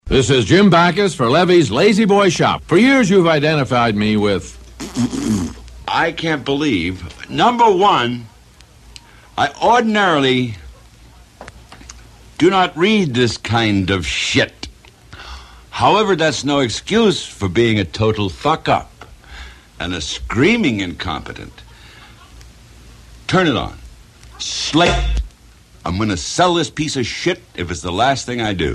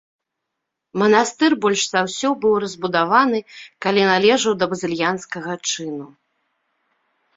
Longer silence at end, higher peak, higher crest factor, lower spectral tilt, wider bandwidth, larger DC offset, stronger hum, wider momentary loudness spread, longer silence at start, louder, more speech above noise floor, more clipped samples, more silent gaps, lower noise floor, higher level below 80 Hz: second, 0 s vs 1.3 s; about the same, 0 dBFS vs -2 dBFS; about the same, 16 dB vs 18 dB; first, -5 dB/octave vs -3.5 dB/octave; first, 12.5 kHz vs 8 kHz; neither; neither; first, 17 LU vs 11 LU; second, 0.05 s vs 0.95 s; first, -16 LUFS vs -19 LUFS; second, 30 dB vs 61 dB; neither; neither; second, -45 dBFS vs -80 dBFS; first, -34 dBFS vs -62 dBFS